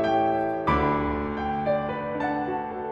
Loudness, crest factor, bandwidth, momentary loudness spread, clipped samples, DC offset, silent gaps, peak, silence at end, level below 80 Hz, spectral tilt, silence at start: -26 LUFS; 16 dB; 7.8 kHz; 6 LU; under 0.1%; under 0.1%; none; -10 dBFS; 0 s; -42 dBFS; -8 dB/octave; 0 s